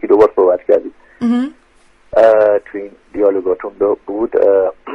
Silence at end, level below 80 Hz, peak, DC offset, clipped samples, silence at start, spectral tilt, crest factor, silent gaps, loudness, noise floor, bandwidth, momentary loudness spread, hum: 0 s; -50 dBFS; 0 dBFS; under 0.1%; under 0.1%; 0.05 s; -7.5 dB/octave; 14 dB; none; -14 LUFS; -49 dBFS; 7.6 kHz; 14 LU; none